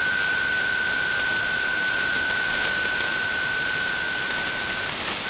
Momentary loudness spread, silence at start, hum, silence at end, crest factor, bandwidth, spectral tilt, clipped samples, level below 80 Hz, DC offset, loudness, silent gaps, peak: 3 LU; 0 s; none; 0 s; 12 dB; 4 kHz; 0.5 dB/octave; under 0.1%; -52 dBFS; under 0.1%; -24 LUFS; none; -12 dBFS